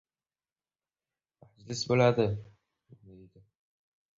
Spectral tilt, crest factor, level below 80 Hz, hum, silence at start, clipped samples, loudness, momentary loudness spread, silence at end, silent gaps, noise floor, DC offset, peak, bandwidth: -6 dB/octave; 24 dB; -62 dBFS; none; 1.7 s; under 0.1%; -28 LUFS; 15 LU; 1.75 s; none; under -90 dBFS; under 0.1%; -10 dBFS; 7.8 kHz